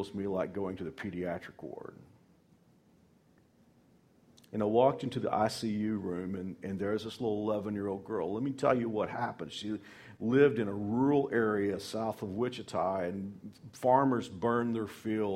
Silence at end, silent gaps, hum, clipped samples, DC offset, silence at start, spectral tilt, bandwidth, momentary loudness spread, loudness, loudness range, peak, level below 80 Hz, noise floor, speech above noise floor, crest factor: 0 s; none; none; under 0.1%; under 0.1%; 0 s; -6.5 dB/octave; 15.5 kHz; 13 LU; -33 LUFS; 11 LU; -12 dBFS; -68 dBFS; -65 dBFS; 33 dB; 20 dB